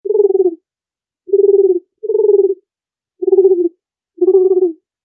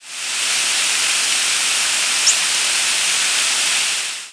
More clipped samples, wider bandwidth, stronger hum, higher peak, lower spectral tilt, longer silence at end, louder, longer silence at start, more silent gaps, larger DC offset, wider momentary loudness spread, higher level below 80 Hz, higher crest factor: neither; second, 1.2 kHz vs 11 kHz; neither; about the same, -2 dBFS vs 0 dBFS; first, -13 dB/octave vs 3.5 dB/octave; first, 0.3 s vs 0 s; about the same, -13 LUFS vs -15 LUFS; about the same, 0.05 s vs 0 s; neither; neither; first, 8 LU vs 4 LU; second, -84 dBFS vs -76 dBFS; second, 12 dB vs 18 dB